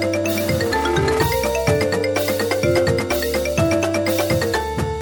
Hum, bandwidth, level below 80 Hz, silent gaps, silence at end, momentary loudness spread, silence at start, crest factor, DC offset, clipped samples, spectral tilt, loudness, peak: none; over 20 kHz; -36 dBFS; none; 0 s; 2 LU; 0 s; 14 dB; under 0.1%; under 0.1%; -5 dB/octave; -19 LUFS; -4 dBFS